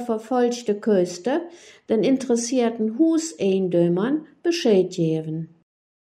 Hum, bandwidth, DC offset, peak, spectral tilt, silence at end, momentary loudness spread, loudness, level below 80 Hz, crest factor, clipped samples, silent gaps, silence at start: none; 12.5 kHz; under 0.1%; -8 dBFS; -5.5 dB/octave; 0.7 s; 7 LU; -22 LUFS; -72 dBFS; 14 dB; under 0.1%; none; 0 s